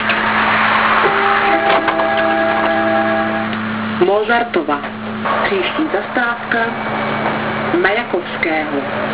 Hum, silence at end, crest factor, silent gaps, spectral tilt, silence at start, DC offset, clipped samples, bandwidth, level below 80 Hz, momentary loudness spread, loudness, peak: none; 0 s; 16 dB; none; -8.5 dB/octave; 0 s; 0.4%; under 0.1%; 4 kHz; -48 dBFS; 7 LU; -15 LUFS; 0 dBFS